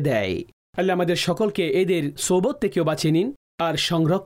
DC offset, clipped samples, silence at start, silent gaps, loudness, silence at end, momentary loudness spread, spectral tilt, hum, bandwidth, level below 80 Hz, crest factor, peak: under 0.1%; under 0.1%; 0 s; 0.53-0.73 s, 3.36-3.58 s; -22 LUFS; 0 s; 7 LU; -5 dB/octave; none; 16 kHz; -54 dBFS; 10 dB; -12 dBFS